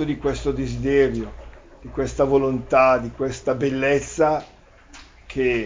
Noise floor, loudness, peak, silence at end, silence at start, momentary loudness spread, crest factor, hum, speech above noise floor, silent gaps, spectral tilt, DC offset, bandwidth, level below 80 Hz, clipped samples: -46 dBFS; -21 LUFS; -4 dBFS; 0 s; 0 s; 10 LU; 18 dB; none; 25 dB; none; -6 dB/octave; under 0.1%; 7.6 kHz; -40 dBFS; under 0.1%